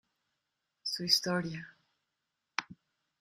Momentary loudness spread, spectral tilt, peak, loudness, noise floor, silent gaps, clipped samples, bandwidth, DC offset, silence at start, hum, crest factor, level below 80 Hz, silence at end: 16 LU; -3 dB/octave; -10 dBFS; -32 LUFS; -86 dBFS; none; under 0.1%; 15 kHz; under 0.1%; 0.85 s; none; 28 dB; -76 dBFS; 0.45 s